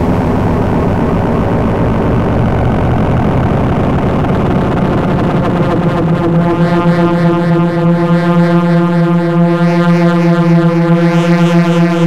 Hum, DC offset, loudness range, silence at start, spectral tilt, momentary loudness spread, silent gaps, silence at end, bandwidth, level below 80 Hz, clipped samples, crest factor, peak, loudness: none; 3%; 2 LU; 0 s; -8.5 dB/octave; 3 LU; none; 0 s; 7.8 kHz; -26 dBFS; under 0.1%; 8 dB; -2 dBFS; -11 LUFS